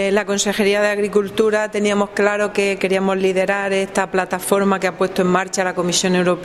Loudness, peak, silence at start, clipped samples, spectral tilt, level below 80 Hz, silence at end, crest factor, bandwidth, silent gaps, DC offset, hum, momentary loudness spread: -18 LUFS; 0 dBFS; 0 s; under 0.1%; -4 dB/octave; -52 dBFS; 0 s; 18 dB; 14.5 kHz; none; under 0.1%; none; 3 LU